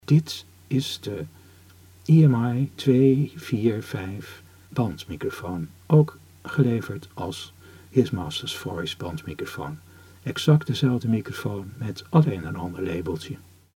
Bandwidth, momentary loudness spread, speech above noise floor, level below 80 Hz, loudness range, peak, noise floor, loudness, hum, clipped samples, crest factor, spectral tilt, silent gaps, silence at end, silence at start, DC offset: 16 kHz; 16 LU; 27 dB; -56 dBFS; 5 LU; -4 dBFS; -51 dBFS; -25 LUFS; none; under 0.1%; 20 dB; -7 dB/octave; none; 0.35 s; 0.1 s; under 0.1%